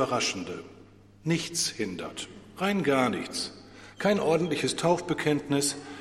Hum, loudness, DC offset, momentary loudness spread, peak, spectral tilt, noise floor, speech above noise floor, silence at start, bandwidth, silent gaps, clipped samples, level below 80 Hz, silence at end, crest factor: none; -28 LUFS; under 0.1%; 13 LU; -10 dBFS; -4 dB/octave; -53 dBFS; 25 dB; 0 s; 16 kHz; none; under 0.1%; -62 dBFS; 0 s; 18 dB